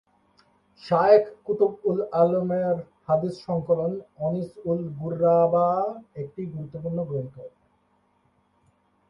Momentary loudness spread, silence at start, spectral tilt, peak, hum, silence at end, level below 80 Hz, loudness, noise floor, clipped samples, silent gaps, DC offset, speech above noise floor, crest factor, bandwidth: 15 LU; 0.85 s; -9.5 dB/octave; -4 dBFS; none; 1.6 s; -62 dBFS; -24 LUFS; -67 dBFS; under 0.1%; none; under 0.1%; 43 dB; 20 dB; 6 kHz